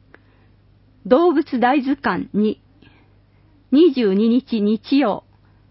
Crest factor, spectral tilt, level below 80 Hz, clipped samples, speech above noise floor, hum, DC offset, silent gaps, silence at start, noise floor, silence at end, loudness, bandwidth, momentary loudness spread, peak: 18 dB; -11 dB/octave; -56 dBFS; under 0.1%; 37 dB; 50 Hz at -55 dBFS; under 0.1%; none; 1.05 s; -53 dBFS; 0.5 s; -18 LUFS; 5.8 kHz; 7 LU; -2 dBFS